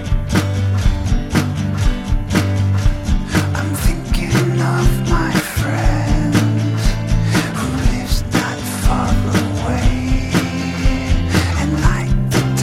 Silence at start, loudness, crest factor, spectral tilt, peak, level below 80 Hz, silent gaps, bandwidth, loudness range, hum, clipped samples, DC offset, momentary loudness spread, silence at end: 0 s; -18 LUFS; 14 dB; -5.5 dB/octave; -2 dBFS; -20 dBFS; none; 16 kHz; 1 LU; none; under 0.1%; under 0.1%; 3 LU; 0 s